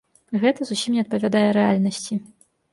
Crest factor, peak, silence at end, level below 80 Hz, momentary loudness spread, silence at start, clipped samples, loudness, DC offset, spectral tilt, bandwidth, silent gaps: 16 dB; -6 dBFS; 0.5 s; -64 dBFS; 10 LU; 0.3 s; under 0.1%; -22 LUFS; under 0.1%; -5.5 dB/octave; 11.5 kHz; none